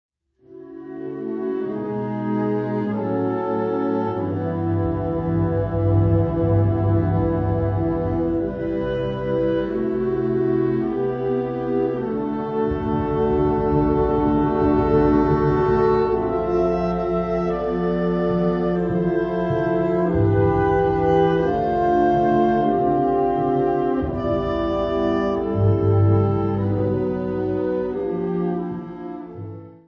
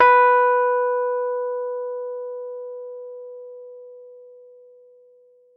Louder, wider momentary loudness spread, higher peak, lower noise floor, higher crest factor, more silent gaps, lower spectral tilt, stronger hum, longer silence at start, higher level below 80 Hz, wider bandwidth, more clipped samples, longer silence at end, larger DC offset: about the same, -21 LUFS vs -21 LUFS; second, 7 LU vs 25 LU; about the same, -6 dBFS vs -4 dBFS; second, -47 dBFS vs -54 dBFS; about the same, 16 dB vs 18 dB; neither; first, -10.5 dB/octave vs -3.5 dB/octave; second, none vs 50 Hz at -95 dBFS; first, 0.5 s vs 0 s; first, -38 dBFS vs -72 dBFS; first, 5.8 kHz vs 5.2 kHz; neither; second, 0.1 s vs 1.25 s; neither